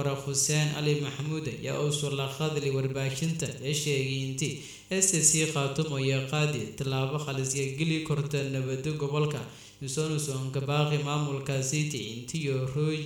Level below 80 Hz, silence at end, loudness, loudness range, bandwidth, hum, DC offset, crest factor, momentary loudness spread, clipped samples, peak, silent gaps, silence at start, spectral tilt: -62 dBFS; 0 s; -29 LUFS; 4 LU; 17 kHz; none; under 0.1%; 20 dB; 8 LU; under 0.1%; -10 dBFS; none; 0 s; -4 dB/octave